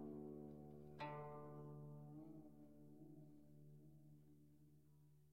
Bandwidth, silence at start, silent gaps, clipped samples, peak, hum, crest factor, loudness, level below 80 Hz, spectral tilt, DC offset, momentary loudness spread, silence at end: 15.5 kHz; 0 s; none; under 0.1%; -40 dBFS; none; 18 dB; -59 LUFS; -80 dBFS; -8 dB/octave; under 0.1%; 13 LU; 0 s